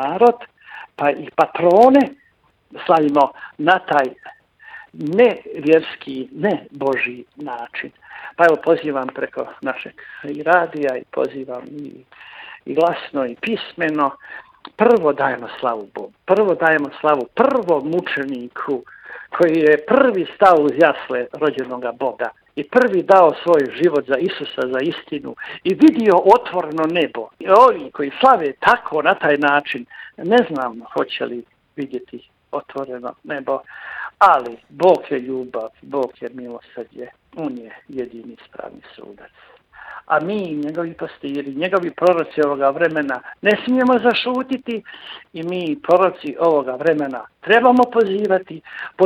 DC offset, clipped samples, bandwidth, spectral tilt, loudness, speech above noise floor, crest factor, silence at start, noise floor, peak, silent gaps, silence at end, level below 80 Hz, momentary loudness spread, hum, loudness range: under 0.1%; under 0.1%; 10 kHz; -6.5 dB/octave; -17 LUFS; 41 dB; 18 dB; 0 s; -58 dBFS; 0 dBFS; none; 0 s; -64 dBFS; 19 LU; none; 10 LU